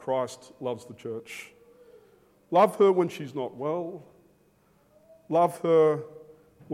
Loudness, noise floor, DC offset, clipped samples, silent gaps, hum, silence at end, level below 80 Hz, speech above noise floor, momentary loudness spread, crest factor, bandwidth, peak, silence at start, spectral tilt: -26 LUFS; -63 dBFS; under 0.1%; under 0.1%; none; none; 0 s; -76 dBFS; 38 dB; 17 LU; 18 dB; 15.5 kHz; -10 dBFS; 0 s; -6.5 dB/octave